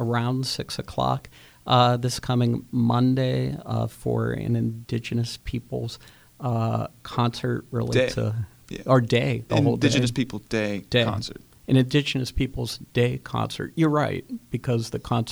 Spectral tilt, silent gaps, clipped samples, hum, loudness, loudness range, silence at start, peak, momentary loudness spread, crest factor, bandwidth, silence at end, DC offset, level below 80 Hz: -6 dB/octave; none; under 0.1%; none; -25 LUFS; 5 LU; 0 s; -6 dBFS; 11 LU; 20 dB; over 20 kHz; 0 s; under 0.1%; -46 dBFS